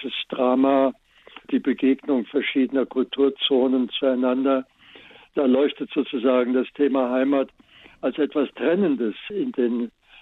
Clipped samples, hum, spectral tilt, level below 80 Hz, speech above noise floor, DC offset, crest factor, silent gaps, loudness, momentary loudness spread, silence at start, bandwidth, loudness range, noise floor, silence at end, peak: under 0.1%; none; -8 dB/octave; -66 dBFS; 27 dB; under 0.1%; 16 dB; none; -22 LUFS; 8 LU; 0 s; 4.1 kHz; 2 LU; -48 dBFS; 0.3 s; -6 dBFS